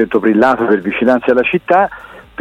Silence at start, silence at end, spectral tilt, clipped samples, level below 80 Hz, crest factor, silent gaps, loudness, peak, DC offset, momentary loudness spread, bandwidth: 0 s; 0.2 s; -7.5 dB/octave; under 0.1%; -48 dBFS; 12 dB; none; -13 LUFS; 0 dBFS; under 0.1%; 8 LU; 9.2 kHz